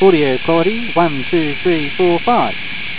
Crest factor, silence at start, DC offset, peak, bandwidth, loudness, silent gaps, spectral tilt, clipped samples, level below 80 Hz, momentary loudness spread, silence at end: 16 dB; 0 s; 7%; 0 dBFS; 4 kHz; -15 LUFS; none; -10 dB/octave; under 0.1%; -46 dBFS; 4 LU; 0 s